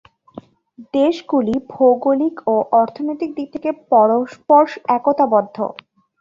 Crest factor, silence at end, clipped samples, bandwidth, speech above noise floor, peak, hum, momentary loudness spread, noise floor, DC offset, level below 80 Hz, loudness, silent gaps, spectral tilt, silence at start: 16 dB; 0.5 s; under 0.1%; 7.6 kHz; 27 dB; -2 dBFS; none; 11 LU; -44 dBFS; under 0.1%; -58 dBFS; -17 LUFS; none; -7.5 dB/octave; 0.8 s